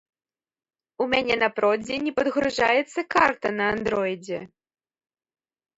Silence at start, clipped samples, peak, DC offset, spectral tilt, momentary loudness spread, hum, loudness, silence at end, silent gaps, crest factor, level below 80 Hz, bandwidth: 1 s; under 0.1%; -6 dBFS; under 0.1%; -4.5 dB/octave; 8 LU; none; -23 LUFS; 1.3 s; none; 20 dB; -58 dBFS; 8 kHz